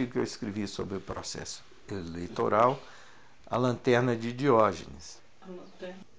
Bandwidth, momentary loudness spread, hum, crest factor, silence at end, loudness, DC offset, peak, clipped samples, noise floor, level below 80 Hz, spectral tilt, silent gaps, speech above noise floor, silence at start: 8 kHz; 21 LU; none; 22 dB; 0.15 s; -29 LUFS; 0.3%; -10 dBFS; under 0.1%; -55 dBFS; -58 dBFS; -5.5 dB/octave; none; 26 dB; 0 s